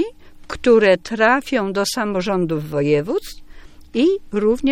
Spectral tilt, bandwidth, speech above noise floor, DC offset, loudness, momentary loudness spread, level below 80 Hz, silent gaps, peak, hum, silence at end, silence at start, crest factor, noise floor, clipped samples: -5 dB/octave; 16.5 kHz; 21 dB; under 0.1%; -18 LUFS; 12 LU; -44 dBFS; none; -2 dBFS; none; 0 s; 0 s; 18 dB; -39 dBFS; under 0.1%